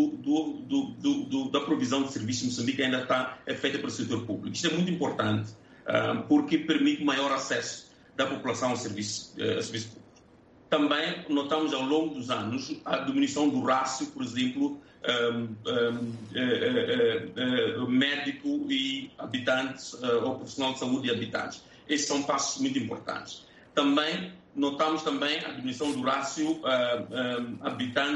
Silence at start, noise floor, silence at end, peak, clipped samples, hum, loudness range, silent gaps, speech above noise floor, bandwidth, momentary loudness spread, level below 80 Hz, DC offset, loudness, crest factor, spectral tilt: 0 s; -57 dBFS; 0 s; -10 dBFS; under 0.1%; none; 2 LU; none; 28 dB; 9.8 kHz; 9 LU; -70 dBFS; under 0.1%; -29 LUFS; 20 dB; -4 dB/octave